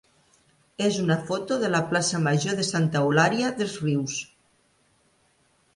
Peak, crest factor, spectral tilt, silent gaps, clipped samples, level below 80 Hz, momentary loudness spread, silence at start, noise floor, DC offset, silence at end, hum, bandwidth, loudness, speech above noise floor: -8 dBFS; 18 dB; -4.5 dB/octave; none; under 0.1%; -64 dBFS; 8 LU; 0.8 s; -65 dBFS; under 0.1%; 1.5 s; none; 11.5 kHz; -24 LUFS; 41 dB